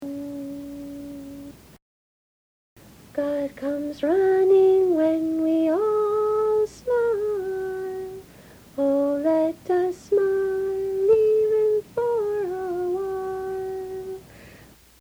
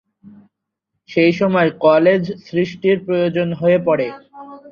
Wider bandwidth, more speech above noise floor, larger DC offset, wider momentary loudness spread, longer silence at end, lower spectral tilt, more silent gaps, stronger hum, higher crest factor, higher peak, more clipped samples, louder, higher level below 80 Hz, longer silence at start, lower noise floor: first, over 20 kHz vs 6.8 kHz; second, 29 dB vs 61 dB; neither; first, 18 LU vs 9 LU; first, 0.5 s vs 0 s; second, -6.5 dB/octave vs -8 dB/octave; first, 1.82-2.76 s vs none; neither; about the same, 14 dB vs 16 dB; second, -10 dBFS vs 0 dBFS; neither; second, -23 LUFS vs -16 LUFS; about the same, -58 dBFS vs -60 dBFS; second, 0 s vs 0.25 s; second, -50 dBFS vs -77 dBFS